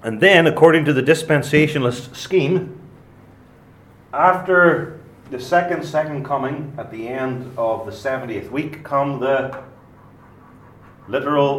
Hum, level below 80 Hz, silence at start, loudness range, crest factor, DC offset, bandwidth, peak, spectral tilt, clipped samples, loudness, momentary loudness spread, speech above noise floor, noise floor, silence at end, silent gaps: none; -56 dBFS; 0 s; 7 LU; 20 dB; under 0.1%; 16 kHz; 0 dBFS; -6 dB/octave; under 0.1%; -18 LUFS; 17 LU; 29 dB; -47 dBFS; 0 s; none